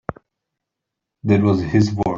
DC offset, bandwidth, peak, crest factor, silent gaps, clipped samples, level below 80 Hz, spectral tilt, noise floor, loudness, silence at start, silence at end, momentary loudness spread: under 0.1%; 7.4 kHz; -4 dBFS; 18 dB; none; under 0.1%; -48 dBFS; -8 dB/octave; -82 dBFS; -17 LUFS; 0.1 s; 0 s; 13 LU